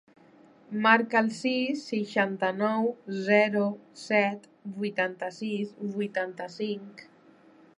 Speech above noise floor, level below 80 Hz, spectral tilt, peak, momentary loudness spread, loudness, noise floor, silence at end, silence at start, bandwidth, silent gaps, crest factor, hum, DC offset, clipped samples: 29 dB; -82 dBFS; -5.5 dB/octave; -6 dBFS; 13 LU; -28 LUFS; -57 dBFS; 0.75 s; 0.7 s; 11 kHz; none; 22 dB; none; under 0.1%; under 0.1%